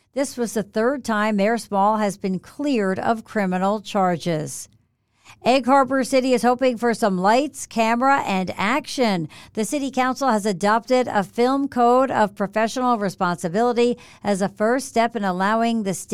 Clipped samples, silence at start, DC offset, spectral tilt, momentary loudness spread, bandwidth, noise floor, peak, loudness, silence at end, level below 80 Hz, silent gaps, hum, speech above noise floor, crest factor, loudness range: under 0.1%; 0.15 s; 0.3%; -5 dB/octave; 8 LU; 15 kHz; -63 dBFS; -6 dBFS; -21 LUFS; 0 s; -60 dBFS; none; none; 42 dB; 14 dB; 3 LU